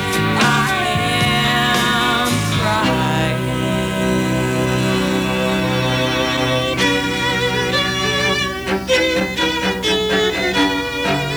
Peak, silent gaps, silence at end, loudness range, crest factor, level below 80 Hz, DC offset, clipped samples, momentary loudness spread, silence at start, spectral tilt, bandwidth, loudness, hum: -2 dBFS; none; 0 s; 2 LU; 14 dB; -38 dBFS; under 0.1%; under 0.1%; 4 LU; 0 s; -4.5 dB/octave; over 20 kHz; -17 LUFS; 60 Hz at -40 dBFS